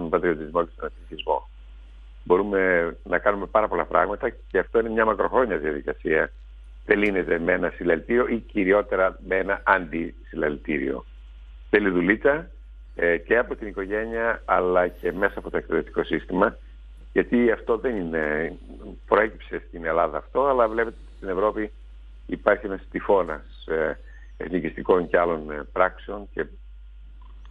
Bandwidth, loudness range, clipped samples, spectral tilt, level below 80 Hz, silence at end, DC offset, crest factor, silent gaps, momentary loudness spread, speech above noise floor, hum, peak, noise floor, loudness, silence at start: 4.7 kHz; 3 LU; under 0.1%; -8 dB/octave; -42 dBFS; 0 s; under 0.1%; 24 dB; none; 12 LU; 20 dB; none; -2 dBFS; -43 dBFS; -24 LUFS; 0 s